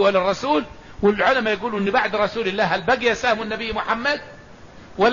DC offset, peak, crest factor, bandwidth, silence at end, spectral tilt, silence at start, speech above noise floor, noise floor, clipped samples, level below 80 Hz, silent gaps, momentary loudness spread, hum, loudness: 0.3%; -6 dBFS; 16 dB; 7.4 kHz; 0 s; -4.5 dB/octave; 0 s; 23 dB; -43 dBFS; under 0.1%; -48 dBFS; none; 6 LU; none; -21 LUFS